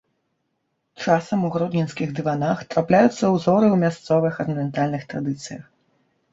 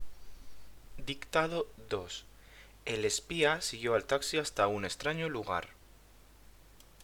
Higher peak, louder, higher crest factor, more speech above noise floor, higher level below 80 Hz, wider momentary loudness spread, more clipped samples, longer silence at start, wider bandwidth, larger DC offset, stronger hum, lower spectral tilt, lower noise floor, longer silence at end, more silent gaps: first, -2 dBFS vs -14 dBFS; first, -21 LUFS vs -34 LUFS; about the same, 18 dB vs 22 dB; first, 53 dB vs 25 dB; about the same, -60 dBFS vs -56 dBFS; about the same, 11 LU vs 13 LU; neither; first, 1 s vs 0 s; second, 8 kHz vs over 20 kHz; neither; neither; first, -7 dB/octave vs -3 dB/octave; first, -74 dBFS vs -58 dBFS; first, 0.7 s vs 0 s; neither